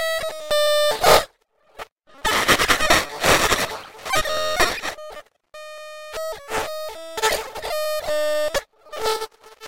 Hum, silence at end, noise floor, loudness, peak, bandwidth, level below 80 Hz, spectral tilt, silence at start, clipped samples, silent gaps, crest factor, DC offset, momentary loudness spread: none; 0 s; -59 dBFS; -20 LUFS; 0 dBFS; 16.5 kHz; -42 dBFS; -1.5 dB/octave; 0 s; under 0.1%; 1.92-1.96 s; 22 dB; under 0.1%; 20 LU